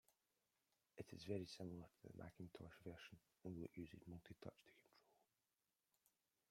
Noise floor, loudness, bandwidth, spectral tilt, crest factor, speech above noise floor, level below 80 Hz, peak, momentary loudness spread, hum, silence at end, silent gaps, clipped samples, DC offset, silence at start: under -90 dBFS; -57 LUFS; 16 kHz; -6.5 dB/octave; 24 dB; over 34 dB; -82 dBFS; -34 dBFS; 11 LU; none; 1.35 s; none; under 0.1%; under 0.1%; 0.95 s